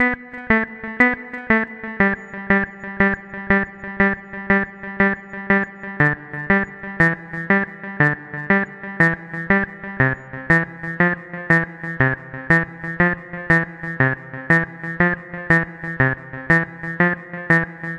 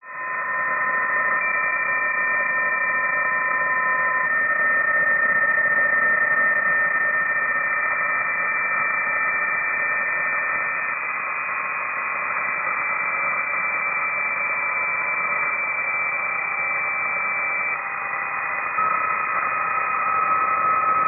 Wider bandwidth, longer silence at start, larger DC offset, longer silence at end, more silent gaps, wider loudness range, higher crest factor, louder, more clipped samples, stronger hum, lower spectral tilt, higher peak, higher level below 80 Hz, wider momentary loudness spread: first, 9.2 kHz vs 2.9 kHz; about the same, 0 s vs 0.05 s; neither; about the same, 0 s vs 0 s; neither; second, 1 LU vs 4 LU; first, 20 dB vs 12 dB; about the same, -20 LUFS vs -20 LUFS; neither; neither; first, -8 dB/octave vs 5.5 dB/octave; first, 0 dBFS vs -10 dBFS; first, -44 dBFS vs -64 dBFS; first, 10 LU vs 6 LU